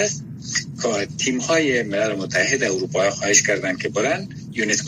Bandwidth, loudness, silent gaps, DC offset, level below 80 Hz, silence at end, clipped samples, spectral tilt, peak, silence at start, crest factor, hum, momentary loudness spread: 15.5 kHz; -20 LUFS; none; under 0.1%; -58 dBFS; 0 s; under 0.1%; -2.5 dB/octave; -2 dBFS; 0 s; 18 dB; none; 9 LU